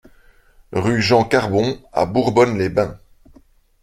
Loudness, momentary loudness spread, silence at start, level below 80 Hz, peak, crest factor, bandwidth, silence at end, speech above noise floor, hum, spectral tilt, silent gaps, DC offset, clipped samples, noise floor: -18 LUFS; 7 LU; 0.7 s; -46 dBFS; -2 dBFS; 18 dB; 14 kHz; 0.85 s; 35 dB; none; -6 dB/octave; none; under 0.1%; under 0.1%; -52 dBFS